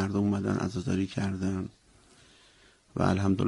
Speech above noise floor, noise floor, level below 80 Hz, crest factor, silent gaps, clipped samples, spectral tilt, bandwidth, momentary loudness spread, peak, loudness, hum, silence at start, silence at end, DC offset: 32 dB; -60 dBFS; -56 dBFS; 20 dB; none; under 0.1%; -7 dB/octave; 11 kHz; 9 LU; -10 dBFS; -30 LUFS; none; 0 s; 0 s; under 0.1%